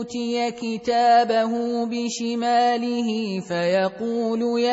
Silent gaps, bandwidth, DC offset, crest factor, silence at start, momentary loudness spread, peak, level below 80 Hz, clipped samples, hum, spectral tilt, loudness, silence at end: none; 8 kHz; under 0.1%; 16 dB; 0 s; 9 LU; -6 dBFS; -66 dBFS; under 0.1%; none; -4.5 dB/octave; -22 LUFS; 0 s